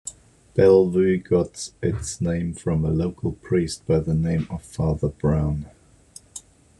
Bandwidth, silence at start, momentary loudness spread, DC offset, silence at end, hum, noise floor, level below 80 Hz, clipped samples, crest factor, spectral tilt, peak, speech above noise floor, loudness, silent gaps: 11.5 kHz; 0.05 s; 16 LU; under 0.1%; 0.4 s; none; -49 dBFS; -40 dBFS; under 0.1%; 18 dB; -7 dB/octave; -4 dBFS; 28 dB; -23 LUFS; none